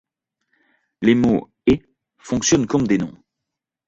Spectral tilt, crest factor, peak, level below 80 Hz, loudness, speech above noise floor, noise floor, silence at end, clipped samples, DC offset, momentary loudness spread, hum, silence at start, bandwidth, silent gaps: -5 dB/octave; 18 dB; -4 dBFS; -46 dBFS; -19 LUFS; 65 dB; -83 dBFS; 0.8 s; under 0.1%; under 0.1%; 6 LU; none; 1 s; 8 kHz; none